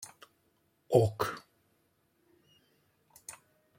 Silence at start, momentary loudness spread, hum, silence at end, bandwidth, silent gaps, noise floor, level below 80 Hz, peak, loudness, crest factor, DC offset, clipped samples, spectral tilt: 0 s; 22 LU; none; 0.45 s; 16.5 kHz; none; -74 dBFS; -70 dBFS; -10 dBFS; -30 LUFS; 26 dB; under 0.1%; under 0.1%; -6 dB/octave